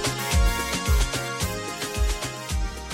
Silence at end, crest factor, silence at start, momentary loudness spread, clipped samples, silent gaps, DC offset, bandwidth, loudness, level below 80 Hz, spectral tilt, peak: 0 s; 14 dB; 0 s; 7 LU; under 0.1%; none; under 0.1%; 16.5 kHz; -26 LUFS; -28 dBFS; -3.5 dB/octave; -10 dBFS